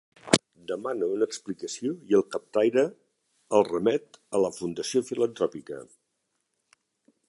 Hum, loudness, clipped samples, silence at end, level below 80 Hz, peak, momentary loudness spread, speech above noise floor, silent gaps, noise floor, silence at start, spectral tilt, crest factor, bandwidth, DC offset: none; -27 LUFS; under 0.1%; 1.45 s; -68 dBFS; 0 dBFS; 10 LU; 51 dB; none; -78 dBFS; 0.25 s; -4 dB/octave; 28 dB; 11.5 kHz; under 0.1%